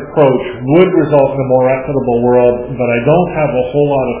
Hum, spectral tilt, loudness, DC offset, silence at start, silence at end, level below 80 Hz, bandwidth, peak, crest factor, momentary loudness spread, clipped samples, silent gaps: none; -11.5 dB/octave; -12 LUFS; under 0.1%; 0 s; 0 s; -40 dBFS; 4 kHz; 0 dBFS; 12 dB; 5 LU; 0.1%; none